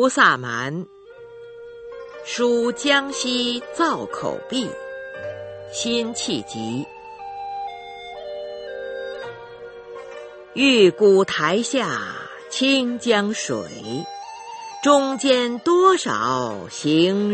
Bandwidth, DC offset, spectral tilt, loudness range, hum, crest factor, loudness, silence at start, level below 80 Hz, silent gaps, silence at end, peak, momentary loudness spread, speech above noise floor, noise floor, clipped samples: 8.8 kHz; under 0.1%; -3.5 dB/octave; 11 LU; none; 20 dB; -20 LUFS; 0 s; -64 dBFS; none; 0 s; -2 dBFS; 21 LU; 22 dB; -42 dBFS; under 0.1%